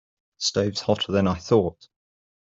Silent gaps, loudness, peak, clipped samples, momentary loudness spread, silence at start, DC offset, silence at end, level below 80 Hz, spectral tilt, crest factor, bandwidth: none; -23 LUFS; -6 dBFS; under 0.1%; 5 LU; 0.4 s; under 0.1%; 0.7 s; -56 dBFS; -5 dB/octave; 20 dB; 8 kHz